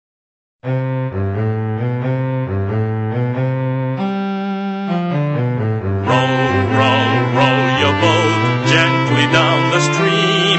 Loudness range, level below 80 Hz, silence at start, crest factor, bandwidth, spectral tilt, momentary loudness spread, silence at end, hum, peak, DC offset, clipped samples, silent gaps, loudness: 6 LU; -54 dBFS; 0.65 s; 14 dB; 8.4 kHz; -5.5 dB/octave; 8 LU; 0 s; none; -2 dBFS; under 0.1%; under 0.1%; none; -16 LUFS